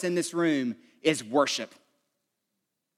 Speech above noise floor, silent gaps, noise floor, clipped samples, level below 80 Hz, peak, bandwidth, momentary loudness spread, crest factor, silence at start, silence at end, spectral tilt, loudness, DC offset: 54 dB; none; -82 dBFS; under 0.1%; -78 dBFS; -10 dBFS; 14.5 kHz; 8 LU; 20 dB; 0 s; 1.3 s; -4 dB/octave; -28 LUFS; under 0.1%